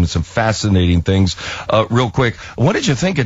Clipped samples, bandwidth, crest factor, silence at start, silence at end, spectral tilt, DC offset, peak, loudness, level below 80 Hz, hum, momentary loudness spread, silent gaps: under 0.1%; 8 kHz; 14 dB; 0 s; 0 s; -5.5 dB/octave; under 0.1%; -2 dBFS; -16 LUFS; -28 dBFS; none; 4 LU; none